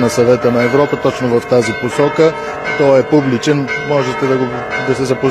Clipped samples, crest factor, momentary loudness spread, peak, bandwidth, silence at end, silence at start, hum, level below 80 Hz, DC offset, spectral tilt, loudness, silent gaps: under 0.1%; 12 dB; 5 LU; 0 dBFS; 14 kHz; 0 s; 0 s; none; -48 dBFS; 0.1%; -6 dB/octave; -13 LUFS; none